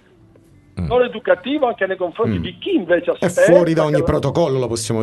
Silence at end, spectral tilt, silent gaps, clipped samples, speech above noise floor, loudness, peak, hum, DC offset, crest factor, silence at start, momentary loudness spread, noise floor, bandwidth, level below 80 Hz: 0 s; -6 dB/octave; none; under 0.1%; 32 dB; -17 LUFS; 0 dBFS; none; under 0.1%; 18 dB; 0.75 s; 9 LU; -49 dBFS; 12 kHz; -42 dBFS